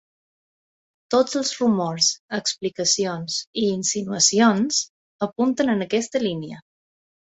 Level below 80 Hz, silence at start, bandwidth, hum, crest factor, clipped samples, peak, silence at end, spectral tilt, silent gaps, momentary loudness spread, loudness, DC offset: -64 dBFS; 1.1 s; 8.2 kHz; none; 20 dB; under 0.1%; -4 dBFS; 0.7 s; -3 dB/octave; 2.19-2.29 s, 3.47-3.53 s, 4.90-5.19 s; 9 LU; -21 LUFS; under 0.1%